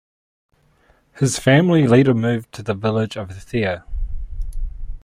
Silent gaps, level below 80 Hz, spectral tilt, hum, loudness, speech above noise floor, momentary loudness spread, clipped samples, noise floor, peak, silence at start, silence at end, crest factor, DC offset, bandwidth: none; -32 dBFS; -6 dB/octave; none; -18 LUFS; 40 dB; 19 LU; under 0.1%; -57 dBFS; -2 dBFS; 1.15 s; 0.05 s; 18 dB; under 0.1%; 15.5 kHz